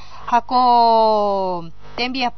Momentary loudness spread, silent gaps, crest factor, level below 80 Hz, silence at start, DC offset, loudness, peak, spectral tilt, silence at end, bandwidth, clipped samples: 12 LU; none; 14 dB; -48 dBFS; 0.1 s; 3%; -17 LUFS; -4 dBFS; -2 dB/octave; 0.1 s; 6.4 kHz; under 0.1%